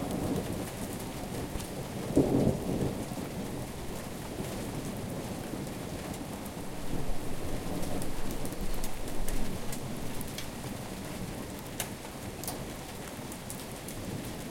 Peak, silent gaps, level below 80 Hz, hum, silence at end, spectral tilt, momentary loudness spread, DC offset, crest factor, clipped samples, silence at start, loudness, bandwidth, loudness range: -10 dBFS; none; -42 dBFS; none; 0 s; -5 dB/octave; 7 LU; under 0.1%; 24 dB; under 0.1%; 0 s; -36 LUFS; 17 kHz; 6 LU